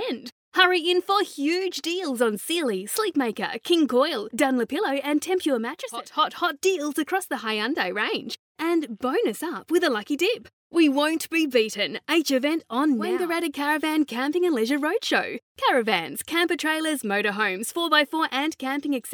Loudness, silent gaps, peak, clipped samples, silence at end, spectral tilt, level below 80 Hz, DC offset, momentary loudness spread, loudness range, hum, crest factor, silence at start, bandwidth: -24 LUFS; 0.32-0.52 s, 8.39-8.55 s, 10.53-10.70 s, 15.42-15.55 s; -4 dBFS; under 0.1%; 0 s; -3 dB/octave; -78 dBFS; under 0.1%; 7 LU; 2 LU; none; 20 dB; 0 s; over 20 kHz